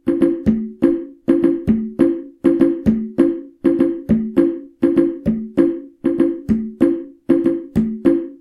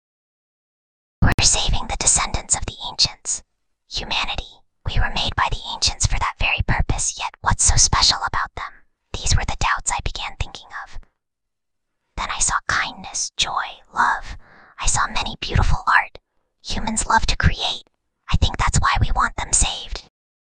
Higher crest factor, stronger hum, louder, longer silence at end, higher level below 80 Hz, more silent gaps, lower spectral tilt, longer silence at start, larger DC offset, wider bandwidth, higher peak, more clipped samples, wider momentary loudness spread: about the same, 16 dB vs 20 dB; neither; about the same, -18 LUFS vs -20 LUFS; second, 0.05 s vs 0.55 s; second, -42 dBFS vs -28 dBFS; second, none vs 1.34-1.38 s; first, -9.5 dB/octave vs -2 dB/octave; second, 0.05 s vs 1.2 s; neither; about the same, 10.5 kHz vs 10 kHz; about the same, 0 dBFS vs -2 dBFS; neither; second, 5 LU vs 14 LU